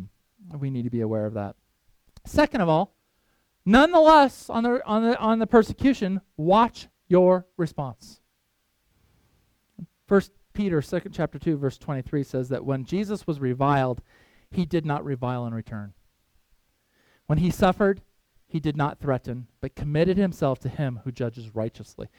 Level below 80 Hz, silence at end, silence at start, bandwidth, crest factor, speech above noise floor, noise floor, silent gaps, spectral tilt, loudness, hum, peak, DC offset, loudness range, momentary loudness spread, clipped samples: -48 dBFS; 0.1 s; 0 s; 16.5 kHz; 22 dB; 49 dB; -72 dBFS; none; -7.5 dB/octave; -24 LUFS; none; -2 dBFS; under 0.1%; 9 LU; 14 LU; under 0.1%